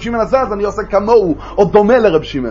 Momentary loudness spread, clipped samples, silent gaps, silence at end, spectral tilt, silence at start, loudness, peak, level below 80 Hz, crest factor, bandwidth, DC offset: 8 LU; under 0.1%; none; 0 s; -7 dB/octave; 0 s; -13 LUFS; 0 dBFS; -34 dBFS; 12 dB; 7.4 kHz; under 0.1%